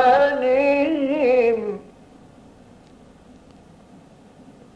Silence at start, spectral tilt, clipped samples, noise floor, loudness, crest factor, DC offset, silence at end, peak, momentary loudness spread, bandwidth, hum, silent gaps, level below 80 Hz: 0 s; -6 dB/octave; under 0.1%; -48 dBFS; -19 LUFS; 16 dB; under 0.1%; 2.95 s; -6 dBFS; 10 LU; 8.8 kHz; none; none; -56 dBFS